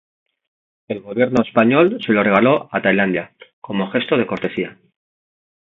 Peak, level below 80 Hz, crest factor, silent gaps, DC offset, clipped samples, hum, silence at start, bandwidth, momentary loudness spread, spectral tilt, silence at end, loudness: 0 dBFS; -58 dBFS; 18 dB; 3.53-3.62 s; under 0.1%; under 0.1%; none; 0.9 s; 7.4 kHz; 13 LU; -7.5 dB/octave; 0.9 s; -17 LUFS